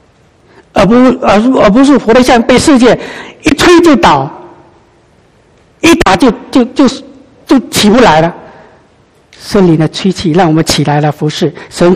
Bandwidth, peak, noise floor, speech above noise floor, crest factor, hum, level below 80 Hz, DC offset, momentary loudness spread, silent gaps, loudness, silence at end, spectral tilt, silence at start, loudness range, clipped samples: 14.5 kHz; 0 dBFS; -45 dBFS; 39 dB; 8 dB; none; -32 dBFS; under 0.1%; 9 LU; none; -7 LUFS; 0 s; -5 dB/octave; 0.75 s; 5 LU; 2%